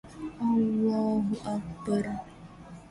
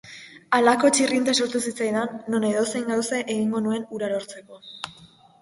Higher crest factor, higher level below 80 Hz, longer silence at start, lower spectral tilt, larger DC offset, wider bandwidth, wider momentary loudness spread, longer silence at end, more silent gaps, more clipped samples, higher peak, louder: second, 14 dB vs 20 dB; first, -56 dBFS vs -68 dBFS; about the same, 0.05 s vs 0.05 s; first, -8 dB/octave vs -3 dB/octave; neither; about the same, 11 kHz vs 11.5 kHz; about the same, 21 LU vs 19 LU; second, 0 s vs 0.35 s; neither; neither; second, -16 dBFS vs -4 dBFS; second, -29 LUFS vs -23 LUFS